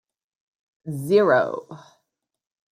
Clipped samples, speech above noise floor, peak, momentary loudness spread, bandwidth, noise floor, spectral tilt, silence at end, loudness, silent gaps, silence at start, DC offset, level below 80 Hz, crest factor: under 0.1%; 58 dB; -6 dBFS; 18 LU; 15.5 kHz; -78 dBFS; -6.5 dB/octave; 1 s; -20 LUFS; none; 0.85 s; under 0.1%; -74 dBFS; 20 dB